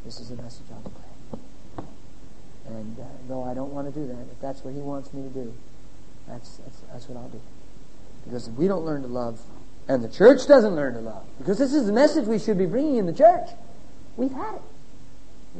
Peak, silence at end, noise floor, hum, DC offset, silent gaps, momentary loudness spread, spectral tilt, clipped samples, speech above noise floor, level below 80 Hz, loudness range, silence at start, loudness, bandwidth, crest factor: -2 dBFS; 0 s; -49 dBFS; none; 3%; none; 26 LU; -6.5 dB/octave; under 0.1%; 25 dB; -52 dBFS; 20 LU; 0.05 s; -22 LUFS; 8.8 kHz; 22 dB